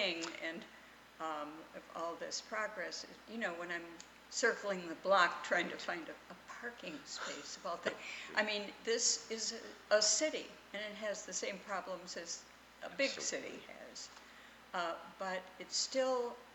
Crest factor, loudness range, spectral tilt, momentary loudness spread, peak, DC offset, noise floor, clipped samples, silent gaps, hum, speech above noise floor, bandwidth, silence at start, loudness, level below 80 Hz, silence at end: 24 dB; 7 LU; -1 dB/octave; 18 LU; -16 dBFS; under 0.1%; -59 dBFS; under 0.1%; none; 60 Hz at -75 dBFS; 20 dB; 19 kHz; 0 s; -38 LUFS; -78 dBFS; 0 s